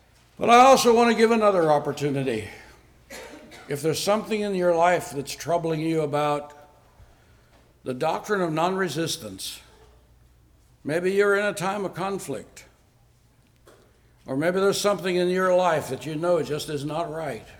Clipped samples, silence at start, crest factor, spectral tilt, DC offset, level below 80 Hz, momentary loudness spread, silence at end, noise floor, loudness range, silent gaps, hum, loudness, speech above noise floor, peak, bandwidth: under 0.1%; 0.4 s; 18 dB; -4.5 dB/octave; under 0.1%; -58 dBFS; 16 LU; 0.1 s; -59 dBFS; 6 LU; none; none; -23 LUFS; 36 dB; -6 dBFS; 19.5 kHz